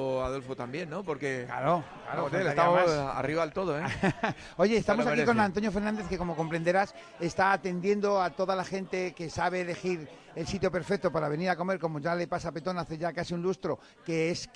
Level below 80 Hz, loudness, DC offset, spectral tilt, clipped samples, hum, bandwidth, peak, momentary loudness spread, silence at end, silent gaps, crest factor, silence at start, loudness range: -54 dBFS; -30 LUFS; under 0.1%; -6 dB/octave; under 0.1%; none; 10.5 kHz; -10 dBFS; 9 LU; 0.1 s; none; 20 dB; 0 s; 4 LU